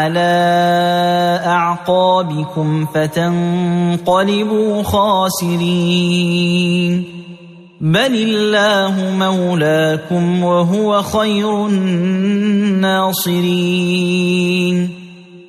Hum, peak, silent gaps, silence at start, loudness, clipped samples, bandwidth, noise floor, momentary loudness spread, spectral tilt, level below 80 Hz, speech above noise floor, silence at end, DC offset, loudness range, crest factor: none; -2 dBFS; none; 0 s; -14 LUFS; under 0.1%; 15 kHz; -37 dBFS; 4 LU; -5.5 dB/octave; -50 dBFS; 23 dB; 0 s; under 0.1%; 1 LU; 12 dB